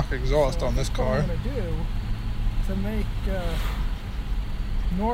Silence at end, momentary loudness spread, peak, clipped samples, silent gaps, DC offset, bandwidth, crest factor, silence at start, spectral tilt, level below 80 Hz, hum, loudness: 0 s; 8 LU; -10 dBFS; under 0.1%; none; under 0.1%; 15.5 kHz; 14 dB; 0 s; -6.5 dB/octave; -26 dBFS; none; -28 LUFS